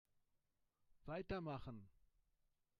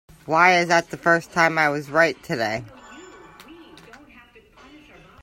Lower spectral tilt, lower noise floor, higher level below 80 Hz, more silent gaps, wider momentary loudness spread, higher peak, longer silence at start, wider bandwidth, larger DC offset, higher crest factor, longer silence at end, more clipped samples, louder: first, -8 dB/octave vs -4.5 dB/octave; first, -85 dBFS vs -50 dBFS; second, -68 dBFS vs -60 dBFS; neither; first, 13 LU vs 10 LU; second, -34 dBFS vs 0 dBFS; first, 0.9 s vs 0.25 s; second, 10 kHz vs 16.5 kHz; neither; about the same, 20 dB vs 22 dB; second, 0.9 s vs 1.7 s; neither; second, -50 LUFS vs -20 LUFS